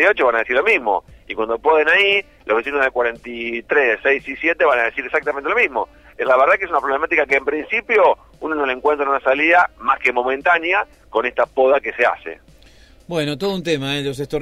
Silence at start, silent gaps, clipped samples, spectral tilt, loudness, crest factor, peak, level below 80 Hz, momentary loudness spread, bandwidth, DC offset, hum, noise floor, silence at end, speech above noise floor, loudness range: 0 s; none; under 0.1%; -5 dB/octave; -17 LUFS; 14 dB; -4 dBFS; -50 dBFS; 10 LU; 13.5 kHz; under 0.1%; none; -47 dBFS; 0 s; 29 dB; 3 LU